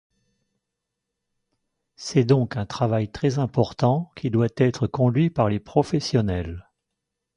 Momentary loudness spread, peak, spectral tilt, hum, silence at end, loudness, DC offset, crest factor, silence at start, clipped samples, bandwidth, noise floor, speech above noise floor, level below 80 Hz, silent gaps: 7 LU; -4 dBFS; -7.5 dB/octave; none; 0.75 s; -23 LUFS; under 0.1%; 20 dB; 2 s; under 0.1%; 10.5 kHz; -83 dBFS; 61 dB; -46 dBFS; none